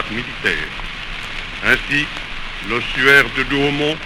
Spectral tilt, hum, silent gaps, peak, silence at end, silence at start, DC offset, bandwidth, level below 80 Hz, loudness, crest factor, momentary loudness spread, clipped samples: -4 dB/octave; none; none; 0 dBFS; 0 s; 0 s; under 0.1%; 16.5 kHz; -32 dBFS; -17 LUFS; 18 dB; 16 LU; under 0.1%